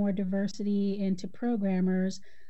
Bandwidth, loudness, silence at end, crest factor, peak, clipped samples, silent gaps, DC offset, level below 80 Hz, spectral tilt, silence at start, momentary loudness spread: 8.2 kHz; -30 LUFS; 0.3 s; 10 dB; -20 dBFS; under 0.1%; none; 1%; -68 dBFS; -7.5 dB/octave; 0 s; 5 LU